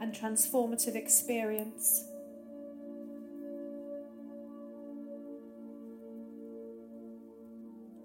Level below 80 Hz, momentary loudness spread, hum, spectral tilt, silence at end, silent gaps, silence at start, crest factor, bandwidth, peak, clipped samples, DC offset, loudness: -78 dBFS; 21 LU; none; -2.5 dB/octave; 0 s; none; 0 s; 26 dB; 16.5 kHz; -12 dBFS; under 0.1%; under 0.1%; -31 LUFS